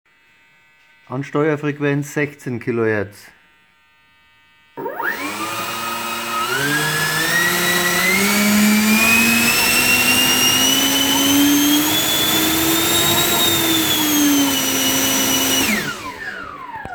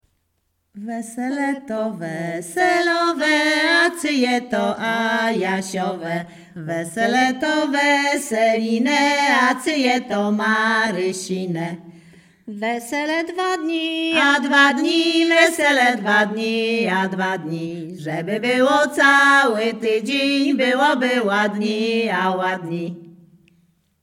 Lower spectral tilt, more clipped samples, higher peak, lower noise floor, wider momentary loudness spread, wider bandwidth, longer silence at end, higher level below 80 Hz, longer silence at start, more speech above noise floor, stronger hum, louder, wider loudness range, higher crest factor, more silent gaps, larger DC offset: second, -2 dB/octave vs -4 dB/octave; neither; about the same, -2 dBFS vs 0 dBFS; second, -55 dBFS vs -70 dBFS; about the same, 12 LU vs 12 LU; first, over 20 kHz vs 16.5 kHz; second, 0 s vs 0.9 s; first, -50 dBFS vs -70 dBFS; first, 1.1 s vs 0.75 s; second, 34 dB vs 51 dB; neither; first, -15 LUFS vs -18 LUFS; first, 12 LU vs 6 LU; about the same, 16 dB vs 20 dB; neither; neither